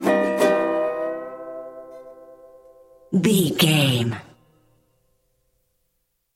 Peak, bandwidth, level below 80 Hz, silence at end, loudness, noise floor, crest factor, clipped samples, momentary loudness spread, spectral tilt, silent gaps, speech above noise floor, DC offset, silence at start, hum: -4 dBFS; 16.5 kHz; -64 dBFS; 2.1 s; -20 LUFS; -72 dBFS; 20 dB; under 0.1%; 21 LU; -5 dB/octave; none; 53 dB; under 0.1%; 0 s; 60 Hz at -45 dBFS